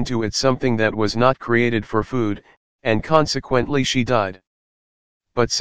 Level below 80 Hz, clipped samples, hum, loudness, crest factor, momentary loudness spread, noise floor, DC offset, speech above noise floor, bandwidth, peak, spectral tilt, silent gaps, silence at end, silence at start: -44 dBFS; under 0.1%; none; -20 LUFS; 20 dB; 7 LU; under -90 dBFS; 2%; over 71 dB; 15 kHz; 0 dBFS; -5 dB/octave; 2.57-2.79 s, 4.47-5.20 s; 0 s; 0 s